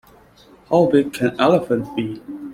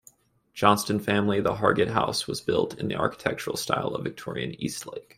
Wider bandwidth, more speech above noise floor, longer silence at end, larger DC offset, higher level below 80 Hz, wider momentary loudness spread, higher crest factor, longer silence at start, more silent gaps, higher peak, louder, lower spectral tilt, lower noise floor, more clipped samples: about the same, 16 kHz vs 16 kHz; about the same, 31 dB vs 32 dB; second, 0 s vs 0.15 s; neither; about the same, -56 dBFS vs -58 dBFS; about the same, 12 LU vs 11 LU; second, 18 dB vs 24 dB; first, 0.7 s vs 0.55 s; neither; about the same, -2 dBFS vs -4 dBFS; first, -18 LUFS vs -26 LUFS; first, -7 dB/octave vs -4.5 dB/octave; second, -49 dBFS vs -58 dBFS; neither